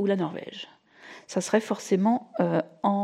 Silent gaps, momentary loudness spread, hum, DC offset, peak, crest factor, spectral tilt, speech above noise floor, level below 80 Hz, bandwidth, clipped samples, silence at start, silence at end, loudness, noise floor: none; 18 LU; none; under 0.1%; -8 dBFS; 18 dB; -6 dB/octave; 23 dB; -78 dBFS; 13 kHz; under 0.1%; 0 s; 0 s; -27 LUFS; -49 dBFS